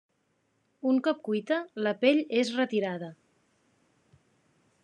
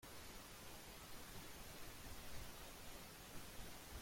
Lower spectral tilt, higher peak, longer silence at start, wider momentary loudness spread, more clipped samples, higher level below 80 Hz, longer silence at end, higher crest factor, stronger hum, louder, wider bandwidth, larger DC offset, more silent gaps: first, -5.5 dB/octave vs -3 dB/octave; first, -10 dBFS vs -38 dBFS; first, 0.85 s vs 0 s; first, 10 LU vs 1 LU; neither; second, -88 dBFS vs -62 dBFS; first, 1.7 s vs 0 s; about the same, 20 dB vs 16 dB; neither; first, -28 LUFS vs -56 LUFS; second, 9.4 kHz vs 16.5 kHz; neither; neither